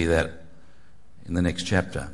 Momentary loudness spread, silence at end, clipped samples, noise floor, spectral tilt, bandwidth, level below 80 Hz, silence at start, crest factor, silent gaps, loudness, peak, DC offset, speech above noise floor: 7 LU; 0 s; under 0.1%; -57 dBFS; -5.5 dB/octave; 11.5 kHz; -44 dBFS; 0 s; 20 dB; none; -26 LUFS; -6 dBFS; 1%; 32 dB